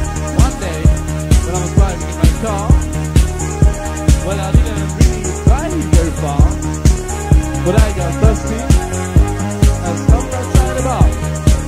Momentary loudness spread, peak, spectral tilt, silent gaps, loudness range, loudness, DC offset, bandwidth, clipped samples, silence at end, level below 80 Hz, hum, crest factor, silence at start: 2 LU; 0 dBFS; -6 dB/octave; none; 1 LU; -15 LUFS; under 0.1%; 15 kHz; under 0.1%; 0 s; -16 dBFS; none; 12 dB; 0 s